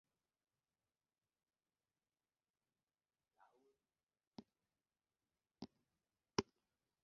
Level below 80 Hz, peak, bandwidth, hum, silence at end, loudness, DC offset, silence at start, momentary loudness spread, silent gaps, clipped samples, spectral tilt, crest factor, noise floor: -80 dBFS; -18 dBFS; 5.4 kHz; none; 0.6 s; -49 LUFS; under 0.1%; 5.6 s; 18 LU; none; under 0.1%; -3.5 dB/octave; 40 dB; under -90 dBFS